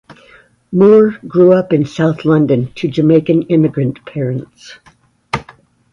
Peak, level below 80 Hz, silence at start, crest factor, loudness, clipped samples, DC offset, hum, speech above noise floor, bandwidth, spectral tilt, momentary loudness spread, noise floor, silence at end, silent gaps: 0 dBFS; -50 dBFS; 0.7 s; 14 dB; -13 LUFS; under 0.1%; under 0.1%; none; 34 dB; 10.5 kHz; -8.5 dB/octave; 14 LU; -46 dBFS; 0.5 s; none